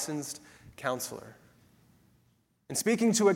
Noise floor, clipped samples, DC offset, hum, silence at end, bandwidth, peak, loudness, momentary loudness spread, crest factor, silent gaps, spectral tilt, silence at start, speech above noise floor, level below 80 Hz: -70 dBFS; under 0.1%; under 0.1%; none; 0 s; 16.5 kHz; -12 dBFS; -31 LUFS; 22 LU; 20 dB; none; -4 dB/octave; 0 s; 41 dB; -70 dBFS